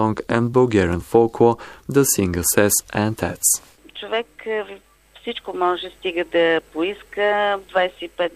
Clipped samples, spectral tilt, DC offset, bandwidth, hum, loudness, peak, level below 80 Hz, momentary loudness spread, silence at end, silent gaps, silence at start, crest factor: under 0.1%; -4 dB/octave; under 0.1%; 15.5 kHz; none; -20 LUFS; -2 dBFS; -48 dBFS; 11 LU; 0.05 s; none; 0 s; 18 dB